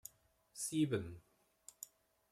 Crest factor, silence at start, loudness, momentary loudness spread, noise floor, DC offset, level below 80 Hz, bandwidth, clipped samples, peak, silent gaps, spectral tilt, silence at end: 20 dB; 0.55 s; -40 LUFS; 23 LU; -70 dBFS; under 0.1%; -74 dBFS; 15.5 kHz; under 0.1%; -24 dBFS; none; -5 dB/octave; 0.45 s